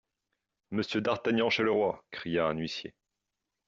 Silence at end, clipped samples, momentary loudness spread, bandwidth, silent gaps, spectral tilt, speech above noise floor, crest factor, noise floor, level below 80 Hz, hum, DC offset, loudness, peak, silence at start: 0.8 s; under 0.1%; 12 LU; 7.6 kHz; none; -3.5 dB/octave; 56 dB; 18 dB; -86 dBFS; -68 dBFS; none; under 0.1%; -30 LUFS; -14 dBFS; 0.7 s